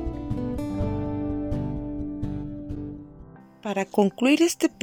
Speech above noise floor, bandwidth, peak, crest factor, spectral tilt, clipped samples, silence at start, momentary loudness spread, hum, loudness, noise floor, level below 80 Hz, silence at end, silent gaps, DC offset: 25 dB; 17 kHz; -6 dBFS; 20 dB; -5.5 dB/octave; under 0.1%; 0 s; 15 LU; none; -27 LUFS; -47 dBFS; -40 dBFS; 0.1 s; none; under 0.1%